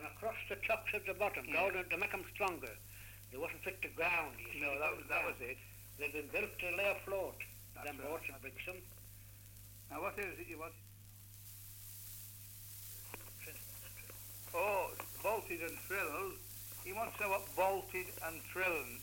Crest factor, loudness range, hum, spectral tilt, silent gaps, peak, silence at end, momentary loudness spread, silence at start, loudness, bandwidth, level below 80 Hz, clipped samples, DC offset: 20 dB; 9 LU; none; -3.5 dB/octave; none; -22 dBFS; 0 s; 15 LU; 0 s; -40 LUFS; 17 kHz; -64 dBFS; under 0.1%; under 0.1%